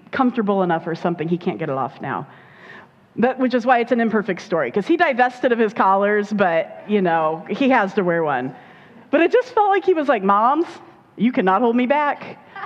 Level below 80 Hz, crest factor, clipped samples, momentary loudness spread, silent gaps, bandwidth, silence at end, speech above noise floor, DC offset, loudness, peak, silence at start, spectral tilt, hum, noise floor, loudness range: -68 dBFS; 18 dB; under 0.1%; 8 LU; none; 8 kHz; 0 s; 25 dB; under 0.1%; -19 LUFS; -2 dBFS; 0.15 s; -7 dB/octave; none; -44 dBFS; 4 LU